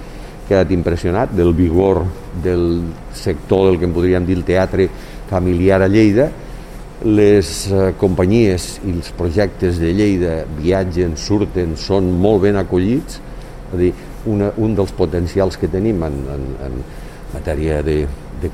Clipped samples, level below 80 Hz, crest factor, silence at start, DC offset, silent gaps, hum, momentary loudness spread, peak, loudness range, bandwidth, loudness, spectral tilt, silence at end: under 0.1%; -30 dBFS; 16 dB; 0 s; under 0.1%; none; none; 14 LU; 0 dBFS; 4 LU; 15 kHz; -16 LUFS; -7 dB/octave; 0 s